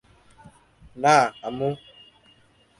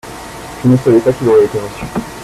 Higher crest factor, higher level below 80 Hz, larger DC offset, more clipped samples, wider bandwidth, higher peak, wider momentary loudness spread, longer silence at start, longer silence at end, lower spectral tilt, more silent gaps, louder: first, 22 dB vs 12 dB; second, -60 dBFS vs -40 dBFS; neither; neither; second, 11.5 kHz vs 14.5 kHz; second, -4 dBFS vs 0 dBFS; second, 11 LU vs 18 LU; first, 0.95 s vs 0.05 s; first, 1.05 s vs 0 s; second, -4.5 dB/octave vs -7.5 dB/octave; neither; second, -22 LUFS vs -13 LUFS